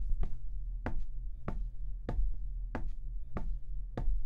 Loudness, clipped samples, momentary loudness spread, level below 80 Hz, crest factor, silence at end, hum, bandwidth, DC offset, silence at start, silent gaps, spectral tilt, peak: -43 LUFS; under 0.1%; 5 LU; -36 dBFS; 14 dB; 0 s; none; 2.9 kHz; under 0.1%; 0 s; none; -9 dB/octave; -18 dBFS